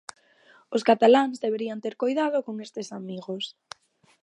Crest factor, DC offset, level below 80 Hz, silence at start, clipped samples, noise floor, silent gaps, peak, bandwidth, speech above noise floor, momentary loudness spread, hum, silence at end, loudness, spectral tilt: 20 dB; under 0.1%; -82 dBFS; 0.7 s; under 0.1%; -58 dBFS; none; -6 dBFS; 11 kHz; 34 dB; 23 LU; none; 0.75 s; -25 LUFS; -5 dB/octave